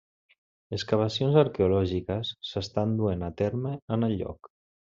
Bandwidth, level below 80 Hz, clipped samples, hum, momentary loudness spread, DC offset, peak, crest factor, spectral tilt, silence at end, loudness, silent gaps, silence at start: 7.6 kHz; -60 dBFS; under 0.1%; none; 11 LU; under 0.1%; -8 dBFS; 20 dB; -6.5 dB/octave; 0.6 s; -28 LUFS; 3.82-3.88 s; 0.7 s